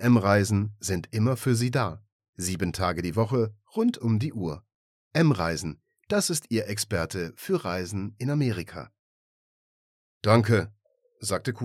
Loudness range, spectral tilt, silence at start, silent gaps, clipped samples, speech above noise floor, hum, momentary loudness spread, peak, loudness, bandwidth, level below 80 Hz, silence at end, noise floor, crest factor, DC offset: 3 LU; -5.5 dB/octave; 0 s; 2.12-2.20 s, 2.29-2.33 s, 4.74-5.11 s, 8.99-10.21 s; under 0.1%; over 64 dB; none; 11 LU; -6 dBFS; -27 LUFS; 15.5 kHz; -54 dBFS; 0 s; under -90 dBFS; 20 dB; under 0.1%